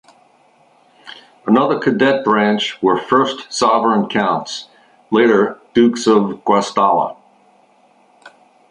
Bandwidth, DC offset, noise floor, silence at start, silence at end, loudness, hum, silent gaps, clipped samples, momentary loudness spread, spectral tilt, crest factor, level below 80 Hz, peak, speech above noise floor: 11 kHz; under 0.1%; -53 dBFS; 1.05 s; 0.45 s; -15 LUFS; none; none; under 0.1%; 9 LU; -5 dB/octave; 16 dB; -60 dBFS; -2 dBFS; 38 dB